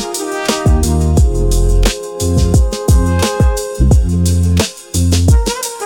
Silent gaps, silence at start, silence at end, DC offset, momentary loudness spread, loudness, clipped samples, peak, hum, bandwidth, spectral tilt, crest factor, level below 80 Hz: none; 0 s; 0 s; 0.3%; 5 LU; -13 LUFS; under 0.1%; 0 dBFS; none; 17.5 kHz; -5.5 dB/octave; 12 dB; -16 dBFS